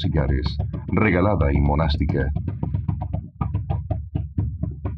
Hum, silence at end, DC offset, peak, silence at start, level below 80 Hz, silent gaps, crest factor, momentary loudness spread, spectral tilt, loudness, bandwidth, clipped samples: none; 0 s; under 0.1%; -4 dBFS; 0 s; -30 dBFS; none; 18 dB; 9 LU; -9.5 dB/octave; -23 LUFS; 5.6 kHz; under 0.1%